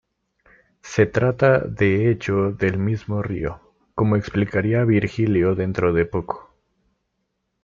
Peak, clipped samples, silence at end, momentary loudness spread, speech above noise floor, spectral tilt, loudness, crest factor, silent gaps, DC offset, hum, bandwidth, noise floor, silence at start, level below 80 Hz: -4 dBFS; under 0.1%; 1.2 s; 9 LU; 55 dB; -8 dB/octave; -21 LUFS; 18 dB; none; under 0.1%; none; 7.4 kHz; -74 dBFS; 0.85 s; -48 dBFS